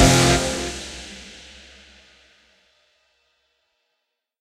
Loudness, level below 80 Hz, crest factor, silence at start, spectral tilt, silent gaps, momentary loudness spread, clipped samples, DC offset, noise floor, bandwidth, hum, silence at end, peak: -20 LUFS; -36 dBFS; 22 dB; 0 s; -4 dB/octave; none; 28 LU; under 0.1%; under 0.1%; -78 dBFS; 15.5 kHz; none; 3.1 s; -2 dBFS